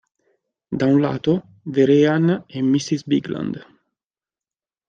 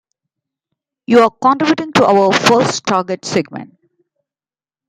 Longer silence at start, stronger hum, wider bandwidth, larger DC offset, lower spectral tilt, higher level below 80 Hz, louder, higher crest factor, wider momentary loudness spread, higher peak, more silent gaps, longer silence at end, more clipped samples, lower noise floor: second, 0.7 s vs 1.1 s; neither; second, 7.6 kHz vs 15.5 kHz; neither; first, -7 dB/octave vs -4.5 dB/octave; about the same, -62 dBFS vs -58 dBFS; second, -19 LUFS vs -13 LUFS; about the same, 16 dB vs 16 dB; about the same, 12 LU vs 10 LU; second, -4 dBFS vs 0 dBFS; neither; about the same, 1.25 s vs 1.2 s; neither; about the same, under -90 dBFS vs under -90 dBFS